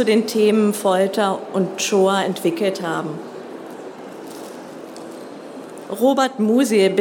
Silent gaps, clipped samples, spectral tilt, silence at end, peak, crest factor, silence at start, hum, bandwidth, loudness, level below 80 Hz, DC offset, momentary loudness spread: none; under 0.1%; -4.5 dB/octave; 0 s; -4 dBFS; 16 dB; 0 s; none; 18 kHz; -18 LUFS; -78 dBFS; under 0.1%; 19 LU